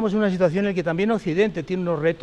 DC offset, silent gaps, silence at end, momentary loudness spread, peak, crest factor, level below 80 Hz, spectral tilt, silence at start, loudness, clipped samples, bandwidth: under 0.1%; none; 0 s; 3 LU; -8 dBFS; 14 dB; -52 dBFS; -7.5 dB/octave; 0 s; -22 LUFS; under 0.1%; 9 kHz